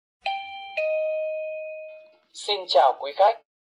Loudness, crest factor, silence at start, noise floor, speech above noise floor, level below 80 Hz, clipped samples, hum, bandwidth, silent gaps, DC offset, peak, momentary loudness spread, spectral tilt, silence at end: -25 LUFS; 18 dB; 0.25 s; -47 dBFS; 25 dB; -80 dBFS; under 0.1%; none; 10.5 kHz; none; under 0.1%; -8 dBFS; 17 LU; 0 dB/octave; 0.35 s